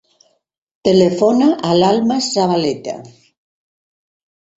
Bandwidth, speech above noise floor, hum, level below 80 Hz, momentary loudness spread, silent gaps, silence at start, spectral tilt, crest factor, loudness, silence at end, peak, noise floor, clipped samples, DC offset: 8 kHz; 43 dB; none; -56 dBFS; 11 LU; none; 0.85 s; -5.5 dB/octave; 16 dB; -15 LUFS; 1.5 s; 0 dBFS; -57 dBFS; under 0.1%; under 0.1%